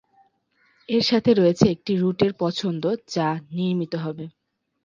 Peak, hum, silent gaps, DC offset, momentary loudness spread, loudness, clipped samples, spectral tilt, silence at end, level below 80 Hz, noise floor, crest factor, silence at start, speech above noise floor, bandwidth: -2 dBFS; none; none; under 0.1%; 11 LU; -22 LUFS; under 0.1%; -6.5 dB/octave; 0.55 s; -56 dBFS; -65 dBFS; 22 dB; 0.9 s; 43 dB; 7.6 kHz